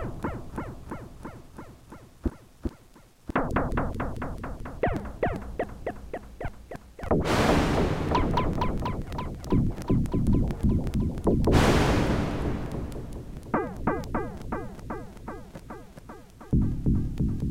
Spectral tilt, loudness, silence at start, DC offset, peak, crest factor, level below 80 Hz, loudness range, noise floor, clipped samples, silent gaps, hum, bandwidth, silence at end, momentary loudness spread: -7 dB/octave; -28 LUFS; 0 s; under 0.1%; -8 dBFS; 20 dB; -34 dBFS; 9 LU; -54 dBFS; under 0.1%; none; none; 16.5 kHz; 0 s; 20 LU